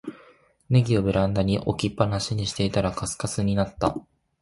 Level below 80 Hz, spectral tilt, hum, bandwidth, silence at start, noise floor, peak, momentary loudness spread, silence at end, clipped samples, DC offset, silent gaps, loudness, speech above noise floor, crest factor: -44 dBFS; -6 dB/octave; none; 11.5 kHz; 0.05 s; -56 dBFS; -6 dBFS; 6 LU; 0.4 s; under 0.1%; under 0.1%; none; -25 LUFS; 32 dB; 18 dB